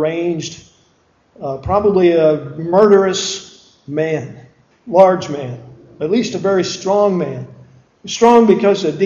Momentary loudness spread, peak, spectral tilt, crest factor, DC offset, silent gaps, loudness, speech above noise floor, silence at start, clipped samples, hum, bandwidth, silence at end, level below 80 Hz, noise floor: 18 LU; 0 dBFS; -5.5 dB/octave; 16 dB; under 0.1%; none; -15 LUFS; 42 dB; 0 s; under 0.1%; none; 7.6 kHz; 0 s; -46 dBFS; -56 dBFS